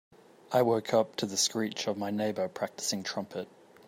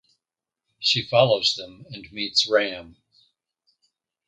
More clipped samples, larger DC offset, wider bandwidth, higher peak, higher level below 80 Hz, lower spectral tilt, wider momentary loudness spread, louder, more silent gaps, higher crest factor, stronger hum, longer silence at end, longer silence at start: neither; neither; first, 16 kHz vs 9.2 kHz; second, -12 dBFS vs -2 dBFS; second, -78 dBFS vs -64 dBFS; about the same, -3.5 dB/octave vs -3.5 dB/octave; second, 10 LU vs 19 LU; second, -31 LUFS vs -21 LUFS; neither; about the same, 20 dB vs 24 dB; neither; second, 0.4 s vs 1.4 s; second, 0.5 s vs 0.8 s